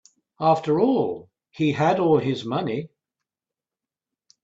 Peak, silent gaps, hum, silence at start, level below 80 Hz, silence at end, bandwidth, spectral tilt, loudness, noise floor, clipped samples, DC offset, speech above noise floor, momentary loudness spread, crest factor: -6 dBFS; none; none; 0.4 s; -64 dBFS; 1.6 s; 7.8 kHz; -7.5 dB/octave; -22 LUFS; -90 dBFS; under 0.1%; under 0.1%; 68 dB; 10 LU; 18 dB